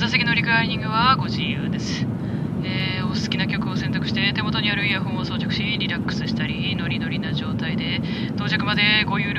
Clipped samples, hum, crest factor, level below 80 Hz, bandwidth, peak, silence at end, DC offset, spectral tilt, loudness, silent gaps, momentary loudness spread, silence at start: under 0.1%; none; 18 dB; -44 dBFS; 9.8 kHz; -4 dBFS; 0 s; under 0.1%; -5.5 dB/octave; -22 LUFS; none; 7 LU; 0 s